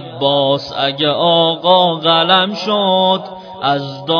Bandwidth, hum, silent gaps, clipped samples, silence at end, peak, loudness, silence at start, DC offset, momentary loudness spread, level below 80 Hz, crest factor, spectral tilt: 5.4 kHz; none; none; under 0.1%; 0 s; 0 dBFS; -13 LUFS; 0 s; under 0.1%; 7 LU; -60 dBFS; 14 dB; -6 dB/octave